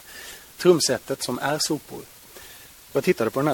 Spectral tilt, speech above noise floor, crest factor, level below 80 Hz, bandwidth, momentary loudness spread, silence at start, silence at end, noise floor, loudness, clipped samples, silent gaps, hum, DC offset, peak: -4 dB/octave; 23 dB; 20 dB; -60 dBFS; 17.5 kHz; 23 LU; 0.05 s; 0 s; -46 dBFS; -23 LUFS; under 0.1%; none; none; under 0.1%; -4 dBFS